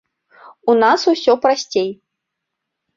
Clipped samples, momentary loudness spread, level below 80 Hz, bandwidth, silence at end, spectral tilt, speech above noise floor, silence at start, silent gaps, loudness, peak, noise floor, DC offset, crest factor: under 0.1%; 9 LU; -64 dBFS; 7.6 kHz; 1.05 s; -3.5 dB/octave; 64 dB; 0.65 s; none; -16 LUFS; -2 dBFS; -79 dBFS; under 0.1%; 16 dB